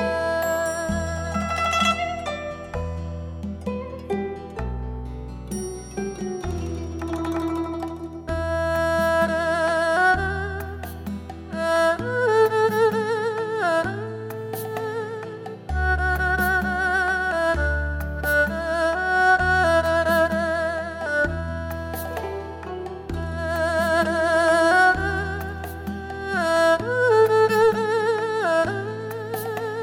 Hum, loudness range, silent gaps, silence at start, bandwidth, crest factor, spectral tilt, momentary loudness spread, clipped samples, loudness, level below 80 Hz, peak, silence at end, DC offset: none; 9 LU; none; 0 s; 17.5 kHz; 14 dB; -5 dB/octave; 14 LU; under 0.1%; -23 LUFS; -36 dBFS; -8 dBFS; 0 s; under 0.1%